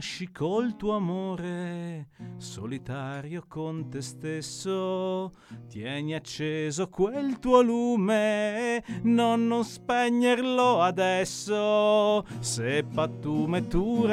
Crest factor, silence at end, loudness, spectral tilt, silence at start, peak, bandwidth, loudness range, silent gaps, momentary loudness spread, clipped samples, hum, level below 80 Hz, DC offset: 20 dB; 0 s; -27 LUFS; -5.5 dB/octave; 0 s; -6 dBFS; 13.5 kHz; 9 LU; none; 14 LU; under 0.1%; none; -50 dBFS; under 0.1%